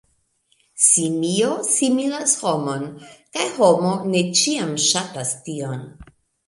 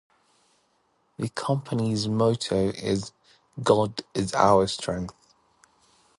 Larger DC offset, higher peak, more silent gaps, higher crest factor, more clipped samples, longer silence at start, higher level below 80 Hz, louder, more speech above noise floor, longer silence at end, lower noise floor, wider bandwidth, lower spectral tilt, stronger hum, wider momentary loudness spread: neither; about the same, -2 dBFS vs -4 dBFS; neither; about the same, 20 dB vs 24 dB; neither; second, 0.75 s vs 1.2 s; second, -60 dBFS vs -54 dBFS; first, -19 LUFS vs -25 LUFS; about the same, 44 dB vs 44 dB; second, 0.45 s vs 1.1 s; second, -65 dBFS vs -69 dBFS; about the same, 11.5 kHz vs 11.5 kHz; second, -3 dB/octave vs -5.5 dB/octave; neither; about the same, 13 LU vs 13 LU